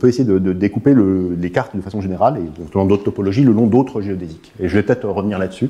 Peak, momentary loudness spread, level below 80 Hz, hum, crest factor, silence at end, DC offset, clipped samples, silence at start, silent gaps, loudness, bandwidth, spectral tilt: -2 dBFS; 11 LU; -46 dBFS; none; 14 dB; 0 s; under 0.1%; under 0.1%; 0 s; none; -17 LUFS; 9.8 kHz; -8.5 dB/octave